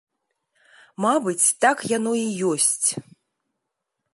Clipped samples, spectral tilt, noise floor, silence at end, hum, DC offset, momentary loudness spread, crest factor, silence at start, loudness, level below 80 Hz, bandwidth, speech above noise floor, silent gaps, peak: under 0.1%; -2.5 dB/octave; -80 dBFS; 1.1 s; none; under 0.1%; 7 LU; 20 dB; 1 s; -21 LUFS; -76 dBFS; 12 kHz; 59 dB; none; -4 dBFS